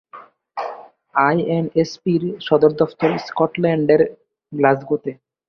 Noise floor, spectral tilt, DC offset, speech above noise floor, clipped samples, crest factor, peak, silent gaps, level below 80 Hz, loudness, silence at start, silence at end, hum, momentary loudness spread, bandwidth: -43 dBFS; -7.5 dB/octave; under 0.1%; 26 dB; under 0.1%; 18 dB; -2 dBFS; none; -60 dBFS; -19 LUFS; 0.15 s; 0.35 s; none; 14 LU; 6.6 kHz